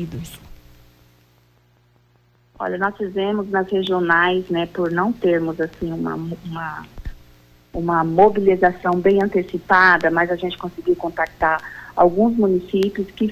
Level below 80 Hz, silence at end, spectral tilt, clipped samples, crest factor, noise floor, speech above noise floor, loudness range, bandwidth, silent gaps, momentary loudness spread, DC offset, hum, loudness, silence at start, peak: -46 dBFS; 0 s; -7 dB/octave; under 0.1%; 18 dB; -57 dBFS; 39 dB; 8 LU; 15.5 kHz; none; 15 LU; under 0.1%; 60 Hz at -50 dBFS; -19 LUFS; 0 s; -2 dBFS